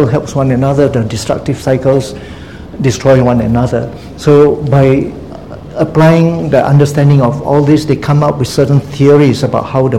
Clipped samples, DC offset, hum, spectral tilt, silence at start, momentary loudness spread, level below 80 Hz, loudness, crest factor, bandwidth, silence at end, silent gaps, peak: 0.8%; 0.8%; none; -7.5 dB/octave; 0 s; 15 LU; -34 dBFS; -10 LUFS; 10 dB; 13 kHz; 0 s; none; 0 dBFS